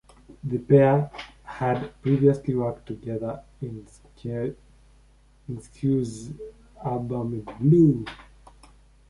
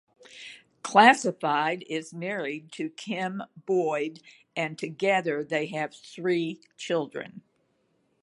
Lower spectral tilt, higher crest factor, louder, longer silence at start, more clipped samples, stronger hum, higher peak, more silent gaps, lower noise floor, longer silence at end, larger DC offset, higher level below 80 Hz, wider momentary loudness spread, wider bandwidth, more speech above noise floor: first, -9 dB/octave vs -4.5 dB/octave; second, 20 dB vs 26 dB; first, -24 LUFS vs -27 LUFS; about the same, 0.3 s vs 0.3 s; neither; neither; second, -6 dBFS vs -2 dBFS; neither; second, -56 dBFS vs -71 dBFS; about the same, 0.85 s vs 0.85 s; neither; first, -52 dBFS vs -80 dBFS; first, 21 LU vs 18 LU; about the same, 11 kHz vs 11.5 kHz; second, 32 dB vs 44 dB